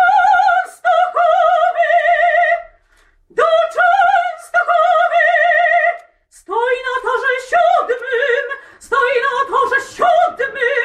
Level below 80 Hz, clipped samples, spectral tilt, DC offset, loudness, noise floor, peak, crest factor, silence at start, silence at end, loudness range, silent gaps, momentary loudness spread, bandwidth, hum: -56 dBFS; under 0.1%; -1.5 dB/octave; under 0.1%; -14 LUFS; -54 dBFS; -4 dBFS; 12 dB; 0 s; 0 s; 3 LU; none; 7 LU; 11.5 kHz; none